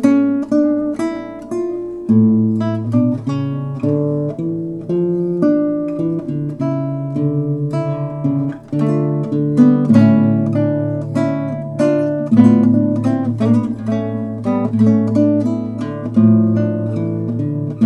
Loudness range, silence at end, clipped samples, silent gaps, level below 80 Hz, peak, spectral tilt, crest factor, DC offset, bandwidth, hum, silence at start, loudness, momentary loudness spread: 4 LU; 0 s; under 0.1%; none; -52 dBFS; 0 dBFS; -10 dB/octave; 16 dB; under 0.1%; 8.2 kHz; none; 0 s; -16 LUFS; 10 LU